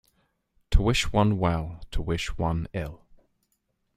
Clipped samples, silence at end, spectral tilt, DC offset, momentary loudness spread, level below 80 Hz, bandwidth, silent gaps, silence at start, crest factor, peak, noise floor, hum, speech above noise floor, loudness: under 0.1%; 1 s; -5.5 dB/octave; under 0.1%; 12 LU; -32 dBFS; 15 kHz; none; 0.7 s; 22 dB; -6 dBFS; -75 dBFS; none; 49 dB; -27 LUFS